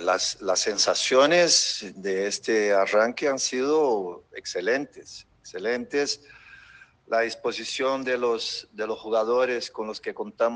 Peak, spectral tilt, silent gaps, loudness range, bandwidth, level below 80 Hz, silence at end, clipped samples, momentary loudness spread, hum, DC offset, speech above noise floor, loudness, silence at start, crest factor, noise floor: -6 dBFS; -1.5 dB/octave; none; 8 LU; 10.5 kHz; -68 dBFS; 0 s; under 0.1%; 14 LU; none; under 0.1%; 27 dB; -24 LUFS; 0 s; 18 dB; -52 dBFS